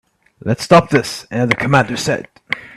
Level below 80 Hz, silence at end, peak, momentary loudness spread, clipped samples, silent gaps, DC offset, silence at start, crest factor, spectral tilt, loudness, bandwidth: -48 dBFS; 0.1 s; 0 dBFS; 13 LU; under 0.1%; none; under 0.1%; 0.45 s; 16 dB; -5.5 dB/octave; -16 LUFS; 13.5 kHz